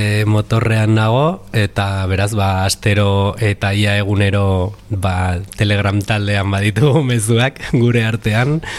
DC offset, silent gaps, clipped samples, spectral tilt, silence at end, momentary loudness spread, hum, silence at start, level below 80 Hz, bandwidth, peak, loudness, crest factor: under 0.1%; none; under 0.1%; -6 dB/octave; 0 s; 5 LU; none; 0 s; -38 dBFS; 13.5 kHz; -2 dBFS; -15 LUFS; 12 dB